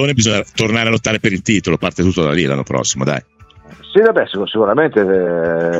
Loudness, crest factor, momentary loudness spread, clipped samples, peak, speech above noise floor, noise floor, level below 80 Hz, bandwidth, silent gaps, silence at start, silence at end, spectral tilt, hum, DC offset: -15 LUFS; 14 dB; 4 LU; under 0.1%; 0 dBFS; 27 dB; -41 dBFS; -44 dBFS; 8.2 kHz; none; 0 s; 0 s; -4.5 dB/octave; none; under 0.1%